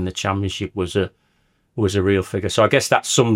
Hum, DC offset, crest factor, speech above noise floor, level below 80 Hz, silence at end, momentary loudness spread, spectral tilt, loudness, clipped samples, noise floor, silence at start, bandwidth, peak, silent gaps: none; under 0.1%; 18 dB; 45 dB; -52 dBFS; 0 s; 9 LU; -4.5 dB/octave; -20 LUFS; under 0.1%; -64 dBFS; 0 s; 16.5 kHz; -2 dBFS; none